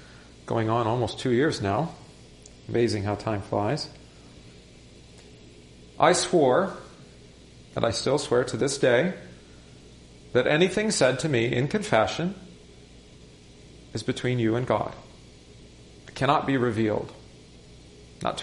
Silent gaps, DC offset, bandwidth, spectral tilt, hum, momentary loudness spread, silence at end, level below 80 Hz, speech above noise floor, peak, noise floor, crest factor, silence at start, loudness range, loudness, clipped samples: none; under 0.1%; 11.5 kHz; -5 dB/octave; 60 Hz at -50 dBFS; 16 LU; 0 s; -54 dBFS; 25 dB; -4 dBFS; -50 dBFS; 22 dB; 0 s; 6 LU; -25 LUFS; under 0.1%